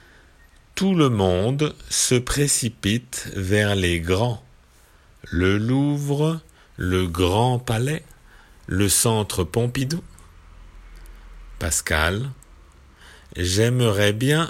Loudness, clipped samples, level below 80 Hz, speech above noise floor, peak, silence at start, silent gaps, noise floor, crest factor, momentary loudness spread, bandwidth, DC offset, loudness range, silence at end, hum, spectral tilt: -21 LUFS; under 0.1%; -42 dBFS; 32 dB; -4 dBFS; 0.75 s; none; -53 dBFS; 18 dB; 10 LU; 16 kHz; under 0.1%; 5 LU; 0 s; none; -4.5 dB/octave